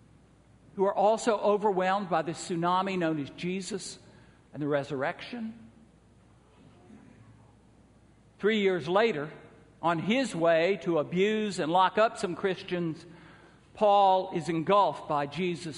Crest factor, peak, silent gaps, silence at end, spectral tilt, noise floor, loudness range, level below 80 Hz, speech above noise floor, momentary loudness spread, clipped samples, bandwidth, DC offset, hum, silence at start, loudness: 18 dB; -10 dBFS; none; 0 s; -5.5 dB/octave; -59 dBFS; 10 LU; -66 dBFS; 32 dB; 12 LU; under 0.1%; 10.5 kHz; under 0.1%; none; 0.75 s; -28 LUFS